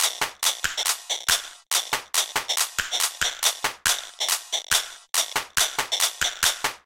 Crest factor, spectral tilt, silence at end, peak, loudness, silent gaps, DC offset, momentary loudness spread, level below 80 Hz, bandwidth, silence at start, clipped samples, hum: 22 dB; 2 dB/octave; 0.1 s; -4 dBFS; -23 LUFS; none; under 0.1%; 3 LU; -54 dBFS; 17 kHz; 0 s; under 0.1%; none